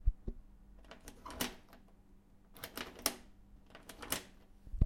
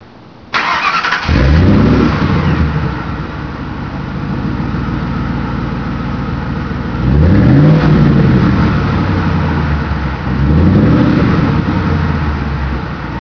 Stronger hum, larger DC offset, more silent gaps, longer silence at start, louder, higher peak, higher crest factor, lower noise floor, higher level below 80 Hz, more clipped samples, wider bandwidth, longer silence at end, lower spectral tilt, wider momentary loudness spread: neither; second, under 0.1% vs 0.4%; neither; about the same, 0 s vs 0 s; second, -43 LUFS vs -13 LUFS; second, -14 dBFS vs 0 dBFS; first, 28 dB vs 12 dB; first, -62 dBFS vs -36 dBFS; second, -46 dBFS vs -20 dBFS; neither; first, 16.5 kHz vs 5.4 kHz; about the same, 0 s vs 0 s; second, -3.5 dB/octave vs -8 dB/octave; first, 24 LU vs 11 LU